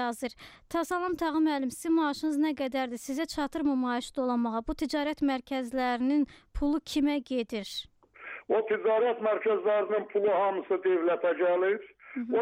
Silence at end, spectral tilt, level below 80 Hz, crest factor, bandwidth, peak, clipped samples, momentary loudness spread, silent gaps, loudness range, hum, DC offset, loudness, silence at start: 0 s; -4.5 dB/octave; -54 dBFS; 12 dB; 16 kHz; -16 dBFS; under 0.1%; 8 LU; none; 3 LU; none; under 0.1%; -29 LUFS; 0 s